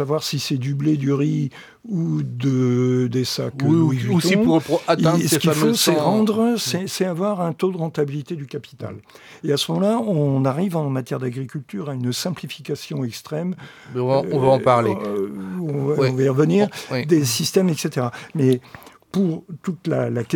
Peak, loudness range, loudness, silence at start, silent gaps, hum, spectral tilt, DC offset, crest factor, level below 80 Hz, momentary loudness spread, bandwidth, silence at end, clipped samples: -2 dBFS; 6 LU; -21 LUFS; 0 s; none; none; -5.5 dB/octave; under 0.1%; 18 dB; -62 dBFS; 12 LU; 19 kHz; 0 s; under 0.1%